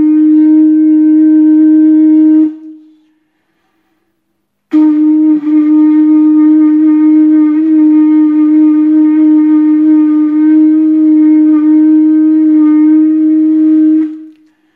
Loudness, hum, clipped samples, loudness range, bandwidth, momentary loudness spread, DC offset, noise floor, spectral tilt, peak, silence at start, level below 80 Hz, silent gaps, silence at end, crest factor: -7 LUFS; none; under 0.1%; 5 LU; 2.6 kHz; 3 LU; under 0.1%; -65 dBFS; -9 dB/octave; 0 dBFS; 0 s; -70 dBFS; none; 0.5 s; 6 dB